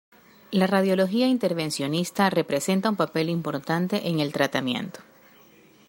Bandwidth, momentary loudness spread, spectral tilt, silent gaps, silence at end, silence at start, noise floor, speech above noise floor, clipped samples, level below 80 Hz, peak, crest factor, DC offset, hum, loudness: 16 kHz; 6 LU; -5.5 dB/octave; none; 0.85 s; 0.5 s; -54 dBFS; 30 dB; under 0.1%; -68 dBFS; -6 dBFS; 18 dB; under 0.1%; none; -24 LUFS